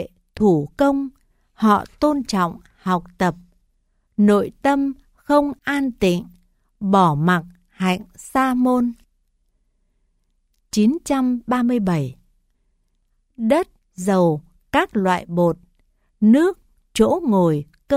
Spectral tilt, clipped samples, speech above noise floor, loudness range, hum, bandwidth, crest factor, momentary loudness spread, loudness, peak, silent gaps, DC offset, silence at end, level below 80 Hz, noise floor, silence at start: -6.5 dB/octave; under 0.1%; 48 dB; 3 LU; none; 15.5 kHz; 18 dB; 10 LU; -20 LUFS; -4 dBFS; none; under 0.1%; 0 s; -50 dBFS; -66 dBFS; 0 s